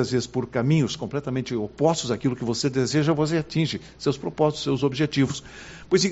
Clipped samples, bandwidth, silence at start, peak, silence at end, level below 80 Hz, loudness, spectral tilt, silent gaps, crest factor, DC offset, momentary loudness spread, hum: under 0.1%; 8 kHz; 0 s; -6 dBFS; 0 s; -54 dBFS; -24 LUFS; -5.5 dB/octave; none; 18 dB; under 0.1%; 6 LU; none